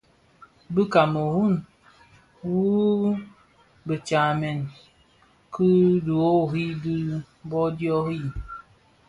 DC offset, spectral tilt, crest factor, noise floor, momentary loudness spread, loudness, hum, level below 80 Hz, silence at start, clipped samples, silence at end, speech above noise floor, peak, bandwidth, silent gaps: under 0.1%; -8 dB/octave; 20 dB; -59 dBFS; 14 LU; -24 LUFS; none; -52 dBFS; 0.7 s; under 0.1%; 0.5 s; 37 dB; -6 dBFS; 11 kHz; none